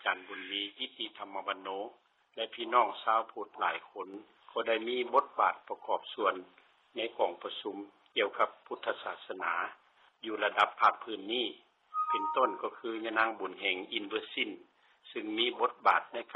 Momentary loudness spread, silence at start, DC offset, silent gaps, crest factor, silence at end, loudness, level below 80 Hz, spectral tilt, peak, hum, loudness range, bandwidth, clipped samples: 13 LU; 0 s; under 0.1%; none; 22 dB; 0 s; -33 LUFS; -86 dBFS; 1.5 dB/octave; -12 dBFS; none; 3 LU; 7.6 kHz; under 0.1%